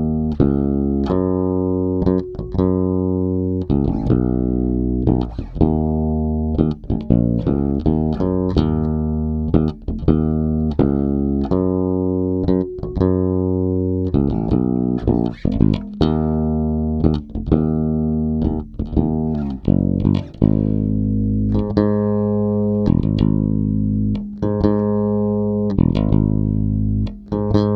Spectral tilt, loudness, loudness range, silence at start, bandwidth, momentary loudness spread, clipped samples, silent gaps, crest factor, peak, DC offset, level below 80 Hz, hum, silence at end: -11 dB/octave; -19 LUFS; 1 LU; 0 s; 5.8 kHz; 4 LU; under 0.1%; none; 18 dB; 0 dBFS; under 0.1%; -28 dBFS; none; 0 s